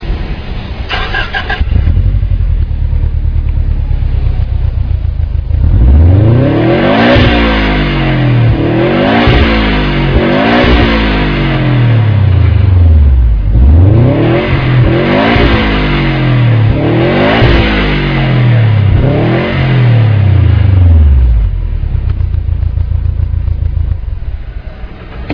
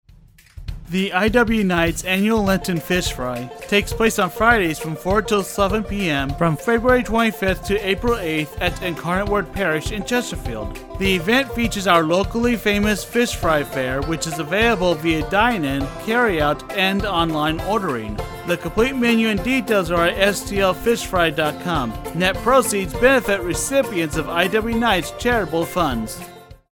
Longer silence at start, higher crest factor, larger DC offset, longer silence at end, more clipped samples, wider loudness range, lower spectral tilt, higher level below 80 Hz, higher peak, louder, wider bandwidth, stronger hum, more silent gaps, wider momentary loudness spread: second, 0 s vs 0.55 s; second, 8 dB vs 18 dB; neither; second, 0 s vs 0.2 s; first, 0.3% vs under 0.1%; first, 6 LU vs 2 LU; first, -9 dB/octave vs -4.5 dB/octave; first, -12 dBFS vs -34 dBFS; about the same, 0 dBFS vs 0 dBFS; first, -9 LUFS vs -19 LUFS; second, 5.4 kHz vs 20 kHz; neither; neither; about the same, 9 LU vs 7 LU